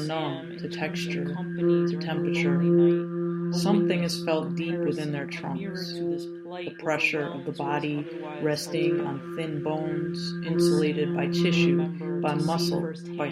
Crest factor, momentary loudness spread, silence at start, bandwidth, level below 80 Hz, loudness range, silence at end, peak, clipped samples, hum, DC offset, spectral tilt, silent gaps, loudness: 16 dB; 10 LU; 0 s; 14 kHz; -66 dBFS; 5 LU; 0 s; -10 dBFS; under 0.1%; none; under 0.1%; -6.5 dB/octave; none; -27 LUFS